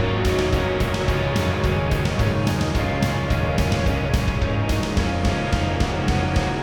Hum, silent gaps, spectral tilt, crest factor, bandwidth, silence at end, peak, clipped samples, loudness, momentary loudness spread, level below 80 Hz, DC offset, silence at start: none; none; -6 dB/octave; 14 dB; 19 kHz; 0 s; -6 dBFS; under 0.1%; -22 LUFS; 1 LU; -28 dBFS; 0.2%; 0 s